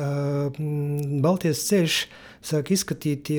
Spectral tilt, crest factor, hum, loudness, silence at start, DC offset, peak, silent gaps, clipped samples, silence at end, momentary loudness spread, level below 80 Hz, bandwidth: -5 dB/octave; 14 dB; none; -24 LUFS; 0 s; under 0.1%; -10 dBFS; none; under 0.1%; 0 s; 7 LU; -60 dBFS; over 20 kHz